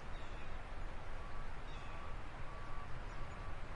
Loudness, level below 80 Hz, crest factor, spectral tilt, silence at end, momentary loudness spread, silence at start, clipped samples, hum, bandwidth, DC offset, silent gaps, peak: -50 LUFS; -46 dBFS; 12 dB; -5.5 dB/octave; 0 s; 1 LU; 0 s; under 0.1%; none; 8.8 kHz; under 0.1%; none; -30 dBFS